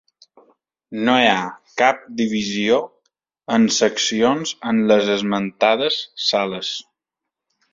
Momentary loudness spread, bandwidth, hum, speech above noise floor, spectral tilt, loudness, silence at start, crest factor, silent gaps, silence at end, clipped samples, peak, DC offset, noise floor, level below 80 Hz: 10 LU; 7.6 kHz; none; 65 dB; -3.5 dB/octave; -19 LUFS; 0.9 s; 18 dB; none; 0.9 s; under 0.1%; -2 dBFS; under 0.1%; -84 dBFS; -62 dBFS